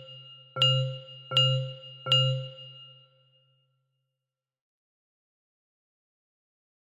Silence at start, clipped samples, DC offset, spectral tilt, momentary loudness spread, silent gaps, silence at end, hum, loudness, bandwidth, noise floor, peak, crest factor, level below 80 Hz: 0 s; under 0.1%; under 0.1%; -4.5 dB/octave; 22 LU; none; 4.1 s; none; -25 LUFS; 8.6 kHz; -89 dBFS; -10 dBFS; 22 dB; -76 dBFS